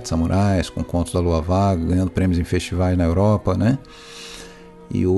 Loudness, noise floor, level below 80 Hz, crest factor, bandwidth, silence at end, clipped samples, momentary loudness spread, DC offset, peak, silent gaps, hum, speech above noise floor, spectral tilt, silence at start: -20 LUFS; -40 dBFS; -34 dBFS; 14 dB; 12 kHz; 0 s; under 0.1%; 17 LU; under 0.1%; -4 dBFS; none; none; 21 dB; -7 dB/octave; 0 s